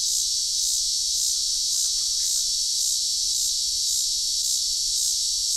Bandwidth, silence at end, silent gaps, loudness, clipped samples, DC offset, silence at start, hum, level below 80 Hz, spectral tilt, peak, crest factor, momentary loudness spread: 16 kHz; 0 s; none; -21 LUFS; under 0.1%; under 0.1%; 0 s; none; -52 dBFS; 4 dB/octave; -10 dBFS; 14 dB; 1 LU